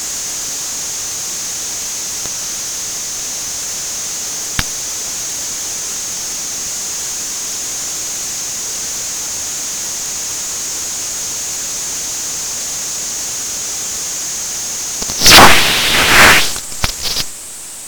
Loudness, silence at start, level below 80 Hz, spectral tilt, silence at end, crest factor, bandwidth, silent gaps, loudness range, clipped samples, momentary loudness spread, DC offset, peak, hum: -14 LUFS; 0 s; -36 dBFS; -0.5 dB/octave; 0 s; 16 dB; over 20 kHz; none; 10 LU; 0.3%; 11 LU; under 0.1%; 0 dBFS; none